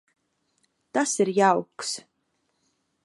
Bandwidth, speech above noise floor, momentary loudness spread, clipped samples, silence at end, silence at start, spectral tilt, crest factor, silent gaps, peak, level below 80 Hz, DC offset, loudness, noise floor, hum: 11.5 kHz; 51 dB; 11 LU; under 0.1%; 1.05 s; 0.95 s; -3.5 dB/octave; 22 dB; none; -6 dBFS; -80 dBFS; under 0.1%; -24 LUFS; -74 dBFS; none